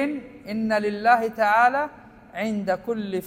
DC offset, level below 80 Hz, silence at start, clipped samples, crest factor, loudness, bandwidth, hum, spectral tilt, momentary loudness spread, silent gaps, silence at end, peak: under 0.1%; -60 dBFS; 0 s; under 0.1%; 18 dB; -23 LUFS; 16 kHz; none; -6 dB/octave; 14 LU; none; 0 s; -4 dBFS